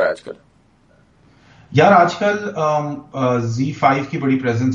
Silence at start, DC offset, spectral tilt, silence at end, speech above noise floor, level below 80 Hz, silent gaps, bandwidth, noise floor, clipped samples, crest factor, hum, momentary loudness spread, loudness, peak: 0 s; under 0.1%; -6.5 dB/octave; 0 s; 37 dB; -56 dBFS; none; 8.8 kHz; -54 dBFS; under 0.1%; 18 dB; none; 10 LU; -17 LUFS; 0 dBFS